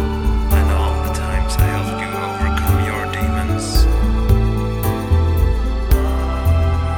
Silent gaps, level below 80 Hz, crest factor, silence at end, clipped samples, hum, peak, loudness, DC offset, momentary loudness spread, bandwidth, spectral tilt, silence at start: none; -18 dBFS; 14 dB; 0 s; under 0.1%; none; -2 dBFS; -18 LUFS; under 0.1%; 4 LU; 18.5 kHz; -6 dB/octave; 0 s